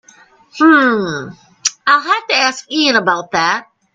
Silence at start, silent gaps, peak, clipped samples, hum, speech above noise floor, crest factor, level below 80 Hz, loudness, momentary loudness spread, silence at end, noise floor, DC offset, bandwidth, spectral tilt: 0.55 s; none; 0 dBFS; under 0.1%; none; 33 dB; 16 dB; -60 dBFS; -13 LUFS; 11 LU; 0.3 s; -47 dBFS; under 0.1%; 9.2 kHz; -2.5 dB/octave